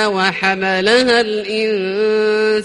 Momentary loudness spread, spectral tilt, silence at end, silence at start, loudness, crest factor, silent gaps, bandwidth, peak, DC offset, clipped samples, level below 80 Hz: 6 LU; -4 dB/octave; 0 s; 0 s; -15 LUFS; 14 dB; none; 11 kHz; 0 dBFS; under 0.1%; under 0.1%; -54 dBFS